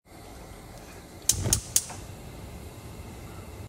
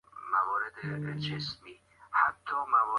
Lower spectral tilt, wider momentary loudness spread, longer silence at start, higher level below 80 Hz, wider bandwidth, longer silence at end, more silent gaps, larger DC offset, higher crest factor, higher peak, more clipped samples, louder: second, -2 dB/octave vs -5.5 dB/octave; first, 21 LU vs 9 LU; about the same, 0.05 s vs 0.15 s; first, -46 dBFS vs -68 dBFS; first, 16 kHz vs 11.5 kHz; about the same, 0 s vs 0 s; neither; neither; first, 30 dB vs 20 dB; first, -4 dBFS vs -12 dBFS; neither; first, -26 LUFS vs -31 LUFS